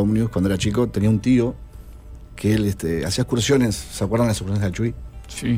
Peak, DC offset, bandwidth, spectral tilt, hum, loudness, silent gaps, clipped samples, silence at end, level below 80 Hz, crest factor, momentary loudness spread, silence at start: -6 dBFS; under 0.1%; 16 kHz; -6 dB/octave; none; -21 LUFS; none; under 0.1%; 0 s; -38 dBFS; 14 dB; 9 LU; 0 s